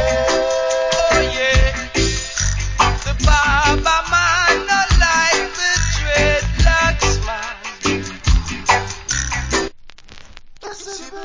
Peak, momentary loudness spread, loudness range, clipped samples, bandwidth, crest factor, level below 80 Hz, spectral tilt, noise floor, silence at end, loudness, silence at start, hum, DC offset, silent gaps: 0 dBFS; 8 LU; 6 LU; under 0.1%; 7.6 kHz; 16 dB; -22 dBFS; -3 dB/octave; -37 dBFS; 0 s; -16 LUFS; 0 s; none; under 0.1%; none